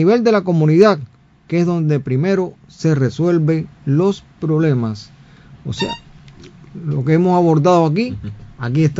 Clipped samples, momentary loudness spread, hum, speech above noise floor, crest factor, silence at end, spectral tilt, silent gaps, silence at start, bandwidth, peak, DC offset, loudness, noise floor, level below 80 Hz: under 0.1%; 15 LU; none; 27 dB; 16 dB; 0 s; -8 dB/octave; none; 0 s; 7.8 kHz; 0 dBFS; under 0.1%; -16 LUFS; -42 dBFS; -50 dBFS